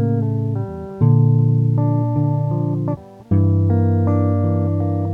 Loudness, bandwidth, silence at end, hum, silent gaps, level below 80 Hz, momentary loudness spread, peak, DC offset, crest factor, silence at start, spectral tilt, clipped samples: -18 LUFS; 2.3 kHz; 0 s; none; none; -48 dBFS; 8 LU; -4 dBFS; under 0.1%; 12 dB; 0 s; -12.5 dB/octave; under 0.1%